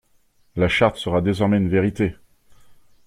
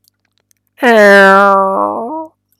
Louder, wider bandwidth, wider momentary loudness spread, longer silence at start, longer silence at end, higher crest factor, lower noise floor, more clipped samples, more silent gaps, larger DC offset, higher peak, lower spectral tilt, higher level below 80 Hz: second, -20 LUFS vs -7 LUFS; second, 11.5 kHz vs 15.5 kHz; second, 7 LU vs 17 LU; second, 0.55 s vs 0.8 s; about the same, 0.35 s vs 0.35 s; first, 18 dB vs 10 dB; about the same, -59 dBFS vs -60 dBFS; second, under 0.1% vs 0.7%; neither; neither; second, -4 dBFS vs 0 dBFS; first, -7 dB/octave vs -5 dB/octave; first, -46 dBFS vs -62 dBFS